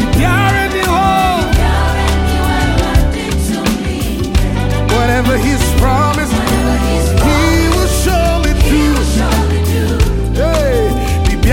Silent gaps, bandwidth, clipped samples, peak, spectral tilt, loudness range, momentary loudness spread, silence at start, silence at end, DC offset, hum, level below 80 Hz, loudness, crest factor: none; 17 kHz; under 0.1%; 0 dBFS; -5.5 dB/octave; 2 LU; 4 LU; 0 s; 0 s; under 0.1%; none; -16 dBFS; -13 LUFS; 12 dB